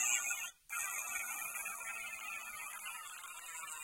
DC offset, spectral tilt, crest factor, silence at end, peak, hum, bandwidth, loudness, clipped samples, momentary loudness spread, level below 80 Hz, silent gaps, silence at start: under 0.1%; 3 dB/octave; 24 dB; 0 s; -18 dBFS; none; 17 kHz; -40 LUFS; under 0.1%; 9 LU; -80 dBFS; none; 0 s